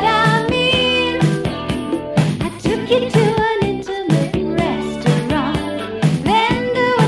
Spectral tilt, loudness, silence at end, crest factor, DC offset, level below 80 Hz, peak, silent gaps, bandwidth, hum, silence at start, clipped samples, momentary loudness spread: -6 dB/octave; -17 LUFS; 0 s; 14 dB; under 0.1%; -38 dBFS; -4 dBFS; none; 12 kHz; none; 0 s; under 0.1%; 7 LU